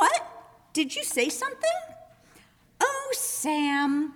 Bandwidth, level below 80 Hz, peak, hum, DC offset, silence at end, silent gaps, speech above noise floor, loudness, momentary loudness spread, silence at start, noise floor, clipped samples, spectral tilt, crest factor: over 20 kHz; -70 dBFS; -10 dBFS; none; under 0.1%; 0 s; none; 31 dB; -27 LUFS; 8 LU; 0 s; -58 dBFS; under 0.1%; -1 dB/octave; 18 dB